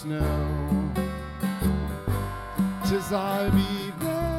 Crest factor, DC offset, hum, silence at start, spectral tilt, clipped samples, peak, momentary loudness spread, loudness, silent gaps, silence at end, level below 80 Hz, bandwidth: 16 dB; under 0.1%; none; 0 s; -6.5 dB/octave; under 0.1%; -10 dBFS; 7 LU; -27 LUFS; none; 0 s; -36 dBFS; 16.5 kHz